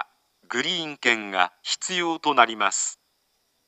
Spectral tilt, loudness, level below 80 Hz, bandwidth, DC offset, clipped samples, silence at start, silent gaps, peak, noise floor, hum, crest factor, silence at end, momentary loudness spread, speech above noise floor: -1 dB/octave; -23 LUFS; -86 dBFS; 9.2 kHz; under 0.1%; under 0.1%; 0 s; none; -2 dBFS; -70 dBFS; none; 24 dB; 0.75 s; 8 LU; 46 dB